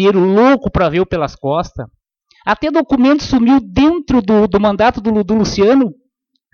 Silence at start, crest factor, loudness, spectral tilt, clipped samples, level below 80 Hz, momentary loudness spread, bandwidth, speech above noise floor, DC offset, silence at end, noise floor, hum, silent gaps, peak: 0 s; 14 dB; -13 LUFS; -6.5 dB/octave; under 0.1%; -36 dBFS; 8 LU; 7 kHz; 55 dB; under 0.1%; 0.6 s; -67 dBFS; none; none; 0 dBFS